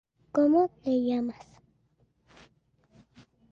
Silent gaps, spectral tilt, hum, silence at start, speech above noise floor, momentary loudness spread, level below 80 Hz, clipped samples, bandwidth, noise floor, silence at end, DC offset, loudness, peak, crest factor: none; -7.5 dB/octave; none; 0.35 s; 44 dB; 12 LU; -68 dBFS; under 0.1%; 7.2 kHz; -69 dBFS; 2.2 s; under 0.1%; -27 LUFS; -14 dBFS; 16 dB